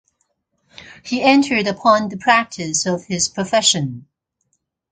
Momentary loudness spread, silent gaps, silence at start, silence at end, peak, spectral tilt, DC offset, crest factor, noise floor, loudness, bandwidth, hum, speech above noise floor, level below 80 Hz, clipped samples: 10 LU; none; 0.8 s; 0.9 s; 0 dBFS; -3 dB/octave; under 0.1%; 18 dB; -70 dBFS; -17 LUFS; 9.6 kHz; none; 53 dB; -56 dBFS; under 0.1%